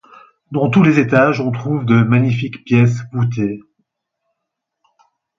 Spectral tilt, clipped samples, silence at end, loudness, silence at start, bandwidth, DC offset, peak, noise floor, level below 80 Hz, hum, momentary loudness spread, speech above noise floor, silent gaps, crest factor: -8.5 dB/octave; under 0.1%; 1.8 s; -15 LUFS; 0.5 s; 7.4 kHz; under 0.1%; 0 dBFS; -78 dBFS; -54 dBFS; none; 10 LU; 64 dB; none; 16 dB